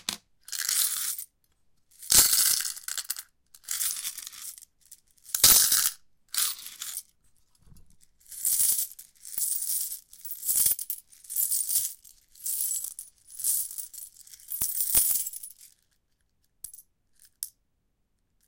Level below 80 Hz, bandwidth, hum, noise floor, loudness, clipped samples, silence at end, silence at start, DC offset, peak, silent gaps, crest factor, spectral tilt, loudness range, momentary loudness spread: -60 dBFS; 17 kHz; none; -74 dBFS; -25 LUFS; under 0.1%; 1 s; 0.1 s; under 0.1%; -4 dBFS; none; 26 dB; 2 dB/octave; 5 LU; 22 LU